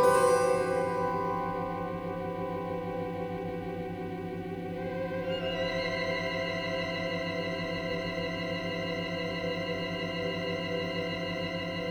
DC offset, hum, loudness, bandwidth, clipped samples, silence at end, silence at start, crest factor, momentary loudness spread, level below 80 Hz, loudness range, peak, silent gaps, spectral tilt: under 0.1%; 50 Hz at -50 dBFS; -32 LUFS; over 20 kHz; under 0.1%; 0 s; 0 s; 20 dB; 7 LU; -56 dBFS; 3 LU; -12 dBFS; none; -5 dB/octave